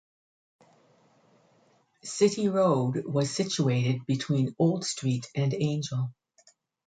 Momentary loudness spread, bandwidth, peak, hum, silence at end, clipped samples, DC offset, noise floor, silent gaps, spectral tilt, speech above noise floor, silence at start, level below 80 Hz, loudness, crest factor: 8 LU; 9.4 kHz; -10 dBFS; none; 0.75 s; under 0.1%; under 0.1%; -65 dBFS; none; -6 dB/octave; 39 dB; 2.05 s; -68 dBFS; -28 LUFS; 18 dB